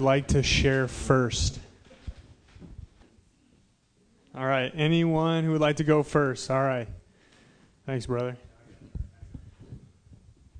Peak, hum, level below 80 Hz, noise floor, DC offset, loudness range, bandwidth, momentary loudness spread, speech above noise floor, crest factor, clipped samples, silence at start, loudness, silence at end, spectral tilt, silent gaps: -8 dBFS; none; -42 dBFS; -65 dBFS; under 0.1%; 12 LU; 10 kHz; 24 LU; 40 dB; 20 dB; under 0.1%; 0 s; -26 LUFS; 0 s; -5.5 dB/octave; none